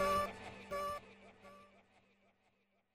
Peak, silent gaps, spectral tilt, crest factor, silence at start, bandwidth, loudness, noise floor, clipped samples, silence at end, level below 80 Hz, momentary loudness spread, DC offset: -26 dBFS; none; -4 dB/octave; 18 dB; 0 s; 16 kHz; -41 LUFS; -78 dBFS; under 0.1%; 1.3 s; -64 dBFS; 22 LU; under 0.1%